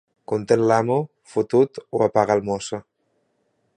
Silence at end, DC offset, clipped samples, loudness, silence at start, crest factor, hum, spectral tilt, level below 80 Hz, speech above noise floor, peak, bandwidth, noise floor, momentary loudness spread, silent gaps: 0.95 s; under 0.1%; under 0.1%; -21 LUFS; 0.3 s; 20 dB; none; -6.5 dB/octave; -60 dBFS; 49 dB; -2 dBFS; 10 kHz; -69 dBFS; 10 LU; none